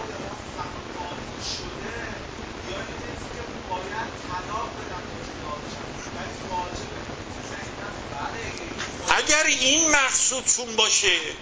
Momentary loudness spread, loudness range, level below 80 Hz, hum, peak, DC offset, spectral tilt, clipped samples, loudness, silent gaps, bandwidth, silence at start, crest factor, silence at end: 17 LU; 13 LU; -46 dBFS; none; -4 dBFS; under 0.1%; -1 dB/octave; under 0.1%; -25 LUFS; none; 8 kHz; 0 s; 24 dB; 0 s